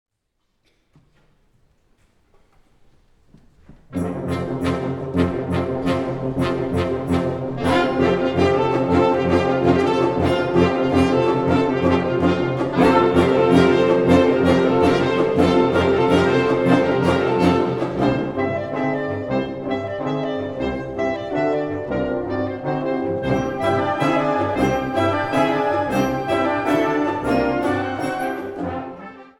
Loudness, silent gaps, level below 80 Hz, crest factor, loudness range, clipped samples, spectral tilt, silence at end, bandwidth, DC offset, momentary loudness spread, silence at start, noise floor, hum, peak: -19 LUFS; none; -44 dBFS; 18 dB; 8 LU; under 0.1%; -7 dB/octave; 0.15 s; 16 kHz; under 0.1%; 9 LU; 3.7 s; -71 dBFS; none; -2 dBFS